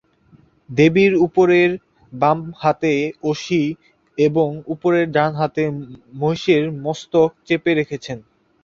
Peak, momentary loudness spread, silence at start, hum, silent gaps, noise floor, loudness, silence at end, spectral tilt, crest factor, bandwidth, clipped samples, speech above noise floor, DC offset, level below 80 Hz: -2 dBFS; 16 LU; 0.7 s; none; none; -53 dBFS; -18 LUFS; 0.45 s; -6.5 dB/octave; 16 dB; 7.4 kHz; under 0.1%; 35 dB; under 0.1%; -56 dBFS